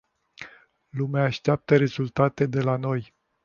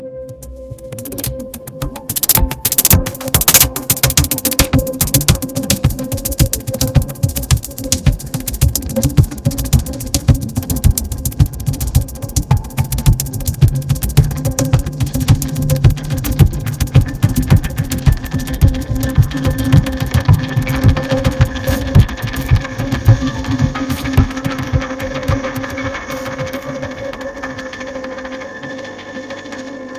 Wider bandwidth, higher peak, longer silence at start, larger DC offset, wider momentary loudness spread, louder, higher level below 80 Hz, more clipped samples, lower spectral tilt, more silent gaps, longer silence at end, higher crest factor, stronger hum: second, 7 kHz vs 16 kHz; second, -6 dBFS vs 0 dBFS; first, 0.4 s vs 0 s; neither; first, 22 LU vs 14 LU; second, -24 LUFS vs -15 LUFS; second, -58 dBFS vs -22 dBFS; second, under 0.1% vs 0.3%; first, -8 dB/octave vs -4.5 dB/octave; neither; first, 0.4 s vs 0 s; about the same, 20 dB vs 16 dB; neither